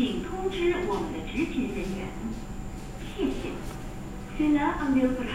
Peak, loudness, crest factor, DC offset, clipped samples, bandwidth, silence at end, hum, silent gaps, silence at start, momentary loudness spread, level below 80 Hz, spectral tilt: -12 dBFS; -30 LUFS; 16 dB; 0.2%; under 0.1%; 16 kHz; 0 s; none; none; 0 s; 14 LU; -40 dBFS; -6 dB/octave